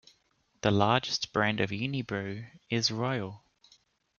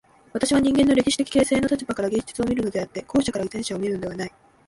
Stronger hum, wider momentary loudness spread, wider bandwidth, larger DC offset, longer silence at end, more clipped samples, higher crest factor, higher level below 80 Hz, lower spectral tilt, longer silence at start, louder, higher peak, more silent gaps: neither; about the same, 10 LU vs 11 LU; second, 7.2 kHz vs 11.5 kHz; neither; first, 0.8 s vs 0.4 s; neither; first, 22 dB vs 16 dB; second, -64 dBFS vs -48 dBFS; about the same, -4.5 dB/octave vs -4.5 dB/octave; first, 0.65 s vs 0.35 s; second, -30 LUFS vs -23 LUFS; second, -10 dBFS vs -6 dBFS; neither